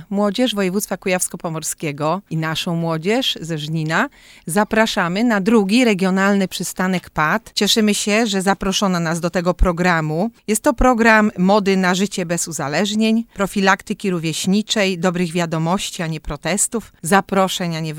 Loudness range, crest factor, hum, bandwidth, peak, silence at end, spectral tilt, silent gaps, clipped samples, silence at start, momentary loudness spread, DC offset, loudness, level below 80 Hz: 4 LU; 18 dB; none; 18 kHz; 0 dBFS; 0 s; -4.5 dB/octave; none; under 0.1%; 0 s; 7 LU; under 0.1%; -18 LUFS; -34 dBFS